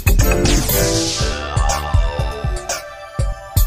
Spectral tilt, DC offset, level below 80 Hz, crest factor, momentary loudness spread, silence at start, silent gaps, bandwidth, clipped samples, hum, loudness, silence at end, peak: -4 dB/octave; under 0.1%; -20 dBFS; 16 dB; 9 LU; 0 s; none; 16 kHz; under 0.1%; none; -18 LUFS; 0 s; 0 dBFS